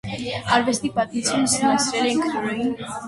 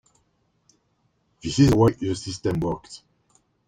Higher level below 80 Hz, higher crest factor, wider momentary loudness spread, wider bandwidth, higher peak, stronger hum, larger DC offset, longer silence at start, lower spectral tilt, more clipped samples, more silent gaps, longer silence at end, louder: second, -54 dBFS vs -46 dBFS; about the same, 18 dB vs 20 dB; second, 7 LU vs 20 LU; second, 12 kHz vs 15.5 kHz; about the same, -4 dBFS vs -4 dBFS; neither; neither; second, 0.05 s vs 1.45 s; second, -3 dB/octave vs -6.5 dB/octave; neither; neither; second, 0 s vs 0.7 s; about the same, -21 LUFS vs -22 LUFS